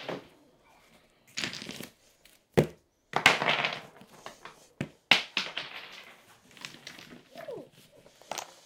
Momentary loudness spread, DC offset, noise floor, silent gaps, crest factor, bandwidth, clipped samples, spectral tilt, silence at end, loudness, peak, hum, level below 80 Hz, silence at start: 25 LU; under 0.1%; -62 dBFS; none; 34 dB; 18 kHz; under 0.1%; -3 dB/octave; 0.1 s; -29 LUFS; 0 dBFS; none; -66 dBFS; 0 s